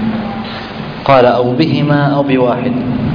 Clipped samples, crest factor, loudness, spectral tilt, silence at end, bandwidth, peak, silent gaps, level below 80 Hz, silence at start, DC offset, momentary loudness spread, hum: under 0.1%; 12 dB; -12 LUFS; -9 dB/octave; 0 s; 5.2 kHz; 0 dBFS; none; -40 dBFS; 0 s; under 0.1%; 13 LU; none